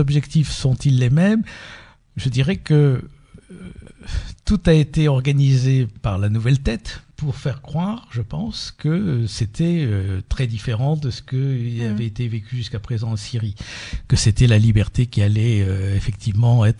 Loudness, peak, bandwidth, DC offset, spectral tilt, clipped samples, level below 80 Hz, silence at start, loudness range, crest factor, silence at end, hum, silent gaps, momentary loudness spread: -20 LUFS; -2 dBFS; 10.5 kHz; under 0.1%; -6.5 dB/octave; under 0.1%; -34 dBFS; 0 s; 5 LU; 16 dB; 0 s; none; none; 13 LU